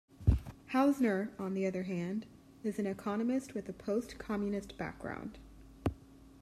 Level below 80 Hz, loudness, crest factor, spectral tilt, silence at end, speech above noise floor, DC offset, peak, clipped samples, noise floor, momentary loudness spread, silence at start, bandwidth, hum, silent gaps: -46 dBFS; -36 LUFS; 20 dB; -7.5 dB/octave; 0 s; 20 dB; under 0.1%; -14 dBFS; under 0.1%; -55 dBFS; 12 LU; 0.2 s; 14.5 kHz; none; none